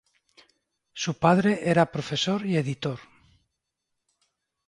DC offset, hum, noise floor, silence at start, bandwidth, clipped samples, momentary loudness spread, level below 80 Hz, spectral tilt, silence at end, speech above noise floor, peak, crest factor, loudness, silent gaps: under 0.1%; none; -82 dBFS; 0.95 s; 11 kHz; under 0.1%; 12 LU; -62 dBFS; -5.5 dB/octave; 1.65 s; 58 dB; -4 dBFS; 24 dB; -25 LUFS; none